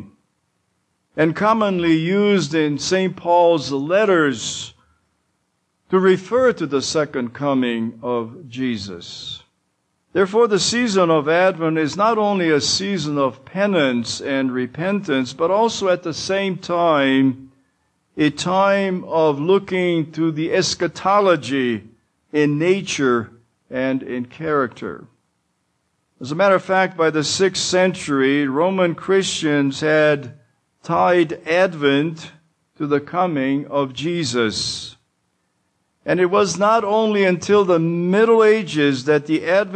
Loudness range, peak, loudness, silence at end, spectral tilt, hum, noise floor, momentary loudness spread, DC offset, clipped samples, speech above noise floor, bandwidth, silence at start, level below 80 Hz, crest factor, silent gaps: 5 LU; -4 dBFS; -18 LUFS; 0 s; -4.5 dB/octave; none; -69 dBFS; 10 LU; under 0.1%; under 0.1%; 51 dB; 9.6 kHz; 0 s; -60 dBFS; 16 dB; none